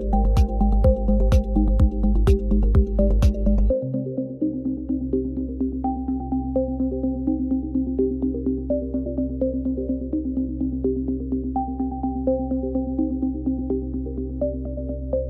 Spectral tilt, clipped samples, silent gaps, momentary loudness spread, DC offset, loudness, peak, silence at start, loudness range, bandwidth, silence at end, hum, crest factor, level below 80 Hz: -10 dB/octave; under 0.1%; none; 7 LU; under 0.1%; -24 LUFS; -6 dBFS; 0 s; 5 LU; 6.4 kHz; 0 s; none; 14 dB; -24 dBFS